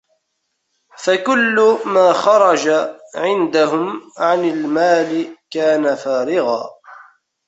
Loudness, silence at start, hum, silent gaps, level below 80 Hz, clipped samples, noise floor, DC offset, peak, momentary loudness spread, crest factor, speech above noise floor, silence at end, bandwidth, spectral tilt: -16 LUFS; 1 s; none; none; -66 dBFS; under 0.1%; -72 dBFS; under 0.1%; -2 dBFS; 11 LU; 14 dB; 57 dB; 0.45 s; 8.2 kHz; -4 dB/octave